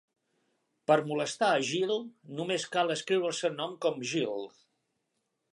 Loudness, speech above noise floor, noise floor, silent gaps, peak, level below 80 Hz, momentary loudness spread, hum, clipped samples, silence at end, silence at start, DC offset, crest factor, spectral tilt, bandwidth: -30 LUFS; 51 dB; -81 dBFS; none; -12 dBFS; -84 dBFS; 11 LU; none; under 0.1%; 1.05 s; 0.9 s; under 0.1%; 20 dB; -4 dB/octave; 11.5 kHz